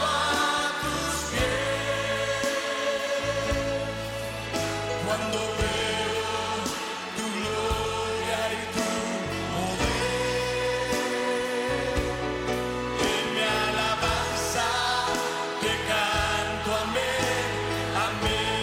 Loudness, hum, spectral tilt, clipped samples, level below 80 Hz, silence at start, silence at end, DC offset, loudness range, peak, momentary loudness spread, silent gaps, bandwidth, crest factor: -27 LUFS; none; -3.5 dB/octave; under 0.1%; -42 dBFS; 0 s; 0 s; under 0.1%; 3 LU; -14 dBFS; 5 LU; none; 16.5 kHz; 14 dB